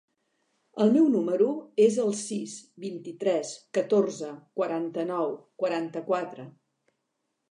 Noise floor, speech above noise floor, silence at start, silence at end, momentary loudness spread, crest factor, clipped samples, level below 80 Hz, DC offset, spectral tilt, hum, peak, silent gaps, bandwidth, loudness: -80 dBFS; 53 dB; 0.75 s; 1 s; 16 LU; 18 dB; under 0.1%; -84 dBFS; under 0.1%; -5.5 dB/octave; none; -10 dBFS; none; 11 kHz; -27 LUFS